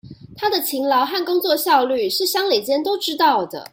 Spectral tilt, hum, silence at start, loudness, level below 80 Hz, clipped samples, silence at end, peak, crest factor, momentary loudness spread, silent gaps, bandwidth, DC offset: -2.5 dB/octave; none; 0.05 s; -19 LUFS; -62 dBFS; under 0.1%; 0.05 s; -4 dBFS; 16 dB; 5 LU; none; 16.5 kHz; under 0.1%